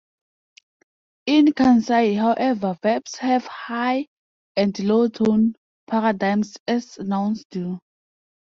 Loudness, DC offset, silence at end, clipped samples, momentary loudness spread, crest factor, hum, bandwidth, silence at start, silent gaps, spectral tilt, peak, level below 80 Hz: -21 LUFS; under 0.1%; 0.65 s; under 0.1%; 12 LU; 16 dB; none; 7.4 kHz; 1.25 s; 4.07-4.55 s, 5.57-5.87 s, 6.60-6.66 s, 7.45-7.50 s; -6 dB/octave; -6 dBFS; -62 dBFS